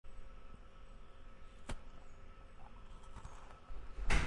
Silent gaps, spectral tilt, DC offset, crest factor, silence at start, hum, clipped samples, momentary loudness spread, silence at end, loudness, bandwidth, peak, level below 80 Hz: none; -4.5 dB/octave; under 0.1%; 22 dB; 0.05 s; none; under 0.1%; 9 LU; 0 s; -53 LUFS; 11 kHz; -20 dBFS; -46 dBFS